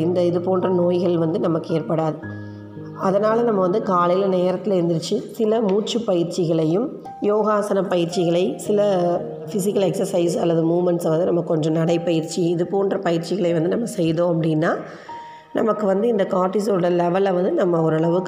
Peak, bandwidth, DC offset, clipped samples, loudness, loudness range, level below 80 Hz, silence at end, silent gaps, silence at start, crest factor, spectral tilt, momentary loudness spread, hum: -6 dBFS; 16 kHz; under 0.1%; under 0.1%; -20 LUFS; 1 LU; -66 dBFS; 0 s; none; 0 s; 14 dB; -7 dB/octave; 7 LU; none